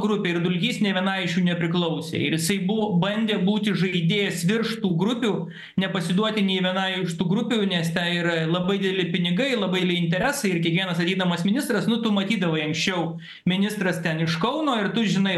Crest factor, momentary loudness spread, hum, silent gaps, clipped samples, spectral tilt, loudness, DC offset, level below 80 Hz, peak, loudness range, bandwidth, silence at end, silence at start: 16 dB; 3 LU; none; none; under 0.1%; -5.5 dB/octave; -23 LUFS; under 0.1%; -62 dBFS; -6 dBFS; 1 LU; 12.5 kHz; 0 s; 0 s